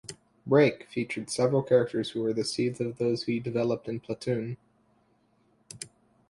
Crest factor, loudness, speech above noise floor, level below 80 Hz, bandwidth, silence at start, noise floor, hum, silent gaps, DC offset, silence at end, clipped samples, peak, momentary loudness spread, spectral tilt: 20 dB; -28 LUFS; 40 dB; -68 dBFS; 11.5 kHz; 0.05 s; -67 dBFS; none; none; under 0.1%; 0.45 s; under 0.1%; -10 dBFS; 20 LU; -5.5 dB/octave